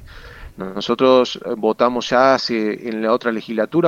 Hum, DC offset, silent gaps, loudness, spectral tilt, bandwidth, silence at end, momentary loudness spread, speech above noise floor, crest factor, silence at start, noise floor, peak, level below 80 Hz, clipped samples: none; under 0.1%; none; -18 LUFS; -5 dB/octave; 7.6 kHz; 0 s; 9 LU; 20 dB; 18 dB; 0 s; -37 dBFS; 0 dBFS; -48 dBFS; under 0.1%